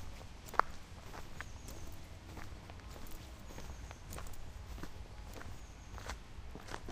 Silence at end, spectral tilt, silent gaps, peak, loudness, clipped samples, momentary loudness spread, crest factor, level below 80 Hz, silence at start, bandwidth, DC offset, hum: 0 s; -4 dB/octave; none; -8 dBFS; -47 LUFS; under 0.1%; 13 LU; 38 dB; -50 dBFS; 0 s; 15.5 kHz; under 0.1%; none